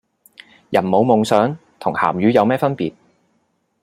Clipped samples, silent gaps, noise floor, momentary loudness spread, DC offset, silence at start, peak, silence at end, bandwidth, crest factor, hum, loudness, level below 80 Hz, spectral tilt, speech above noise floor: under 0.1%; none; -66 dBFS; 10 LU; under 0.1%; 0.7 s; -2 dBFS; 0.95 s; 15.5 kHz; 18 dB; none; -17 LUFS; -60 dBFS; -6.5 dB/octave; 50 dB